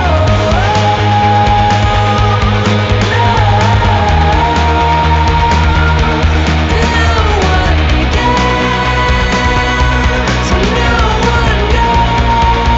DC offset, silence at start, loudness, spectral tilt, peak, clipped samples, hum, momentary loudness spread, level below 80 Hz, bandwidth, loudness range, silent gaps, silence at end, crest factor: under 0.1%; 0 s; -10 LUFS; -5.5 dB/octave; 0 dBFS; under 0.1%; none; 2 LU; -16 dBFS; 8 kHz; 1 LU; none; 0 s; 10 dB